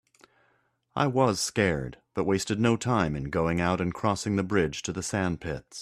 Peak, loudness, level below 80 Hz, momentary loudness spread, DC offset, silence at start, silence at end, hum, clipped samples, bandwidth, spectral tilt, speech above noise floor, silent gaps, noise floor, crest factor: -8 dBFS; -27 LUFS; -52 dBFS; 8 LU; under 0.1%; 0.95 s; 0 s; none; under 0.1%; 14 kHz; -5 dB/octave; 43 dB; none; -70 dBFS; 18 dB